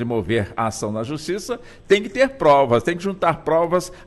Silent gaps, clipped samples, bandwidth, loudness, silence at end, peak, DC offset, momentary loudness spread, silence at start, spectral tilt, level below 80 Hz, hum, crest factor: none; under 0.1%; 12.5 kHz; -20 LUFS; 0.05 s; -4 dBFS; under 0.1%; 11 LU; 0 s; -5.5 dB/octave; -46 dBFS; none; 16 dB